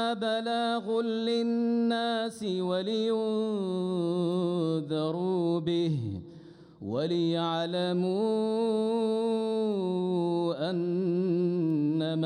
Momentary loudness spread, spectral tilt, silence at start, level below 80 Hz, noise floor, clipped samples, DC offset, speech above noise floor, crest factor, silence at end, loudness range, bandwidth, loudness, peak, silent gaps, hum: 3 LU; -7 dB/octave; 0 s; -72 dBFS; -50 dBFS; under 0.1%; under 0.1%; 22 dB; 12 dB; 0 s; 2 LU; 11 kHz; -29 LUFS; -18 dBFS; none; none